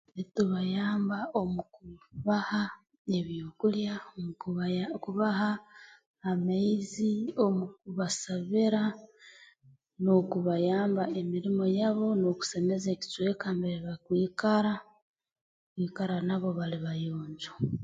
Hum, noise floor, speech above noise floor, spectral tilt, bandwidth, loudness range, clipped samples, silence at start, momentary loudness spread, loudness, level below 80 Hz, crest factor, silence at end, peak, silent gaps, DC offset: none; -62 dBFS; 32 dB; -6 dB/octave; 9.2 kHz; 4 LU; under 0.1%; 0.15 s; 11 LU; -31 LUFS; -66 dBFS; 18 dB; 0 s; -12 dBFS; 2.99-3.05 s, 6.06-6.14 s, 15.02-15.14 s, 15.41-15.76 s; under 0.1%